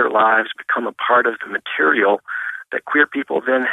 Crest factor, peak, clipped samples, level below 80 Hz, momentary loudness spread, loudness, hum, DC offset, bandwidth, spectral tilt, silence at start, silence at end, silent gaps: 16 dB; -2 dBFS; under 0.1%; -74 dBFS; 10 LU; -18 LUFS; none; under 0.1%; 11.5 kHz; -5 dB/octave; 0 s; 0 s; none